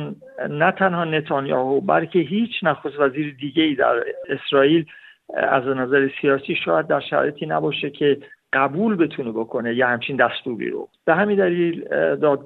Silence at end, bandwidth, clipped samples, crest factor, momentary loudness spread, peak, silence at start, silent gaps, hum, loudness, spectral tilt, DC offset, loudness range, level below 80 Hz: 0 s; 4.3 kHz; under 0.1%; 18 dB; 9 LU; -2 dBFS; 0 s; none; none; -20 LUFS; -8.5 dB/octave; under 0.1%; 1 LU; -66 dBFS